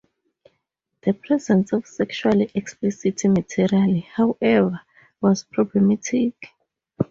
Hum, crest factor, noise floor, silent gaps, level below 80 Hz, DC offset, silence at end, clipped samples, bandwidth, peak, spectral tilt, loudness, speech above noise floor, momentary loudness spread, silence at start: none; 16 dB; -76 dBFS; none; -58 dBFS; under 0.1%; 0.05 s; under 0.1%; 7.8 kHz; -6 dBFS; -6.5 dB/octave; -21 LUFS; 56 dB; 7 LU; 1.05 s